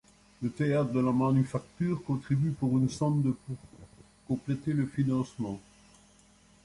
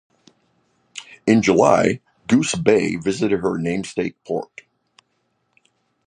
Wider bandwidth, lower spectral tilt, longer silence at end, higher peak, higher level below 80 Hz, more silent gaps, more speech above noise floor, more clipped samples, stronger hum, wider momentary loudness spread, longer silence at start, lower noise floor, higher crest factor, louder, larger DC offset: about the same, 11.5 kHz vs 10.5 kHz; first, -8 dB/octave vs -5.5 dB/octave; second, 1.05 s vs 1.65 s; second, -16 dBFS vs 0 dBFS; second, -60 dBFS vs -54 dBFS; neither; second, 32 dB vs 51 dB; neither; neither; second, 11 LU vs 16 LU; second, 0.4 s vs 0.95 s; second, -61 dBFS vs -69 dBFS; second, 14 dB vs 20 dB; second, -30 LUFS vs -19 LUFS; neither